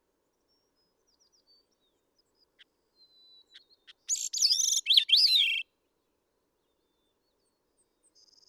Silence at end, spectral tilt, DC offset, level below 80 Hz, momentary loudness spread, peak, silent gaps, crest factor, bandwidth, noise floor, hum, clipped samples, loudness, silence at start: 2.85 s; 7.5 dB/octave; under 0.1%; -90 dBFS; 13 LU; -8 dBFS; none; 24 dB; 20 kHz; -77 dBFS; none; under 0.1%; -23 LUFS; 4.1 s